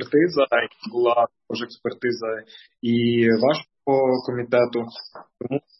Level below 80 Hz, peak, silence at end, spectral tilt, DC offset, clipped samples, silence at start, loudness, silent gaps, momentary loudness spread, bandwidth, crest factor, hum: -68 dBFS; -6 dBFS; 0.2 s; -7.5 dB/octave; under 0.1%; under 0.1%; 0 s; -22 LUFS; none; 12 LU; 6 kHz; 16 dB; none